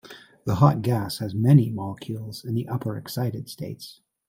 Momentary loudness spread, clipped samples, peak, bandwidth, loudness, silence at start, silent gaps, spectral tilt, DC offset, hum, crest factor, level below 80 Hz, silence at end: 17 LU; under 0.1%; -2 dBFS; 16 kHz; -24 LUFS; 0.05 s; none; -7.5 dB/octave; under 0.1%; none; 22 dB; -58 dBFS; 0.35 s